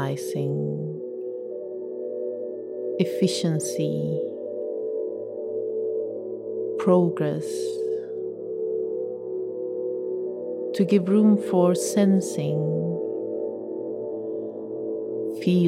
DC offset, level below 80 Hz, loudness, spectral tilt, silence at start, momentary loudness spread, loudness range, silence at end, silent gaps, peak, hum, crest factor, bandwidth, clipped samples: under 0.1%; -74 dBFS; -26 LUFS; -6.5 dB/octave; 0 s; 12 LU; 7 LU; 0 s; none; -6 dBFS; none; 18 dB; 15.5 kHz; under 0.1%